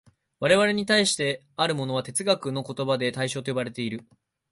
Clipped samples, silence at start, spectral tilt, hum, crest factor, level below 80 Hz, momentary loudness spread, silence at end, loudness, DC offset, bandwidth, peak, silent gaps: under 0.1%; 0.4 s; -3.5 dB/octave; none; 18 dB; -64 dBFS; 10 LU; 0.5 s; -25 LUFS; under 0.1%; 11.5 kHz; -8 dBFS; none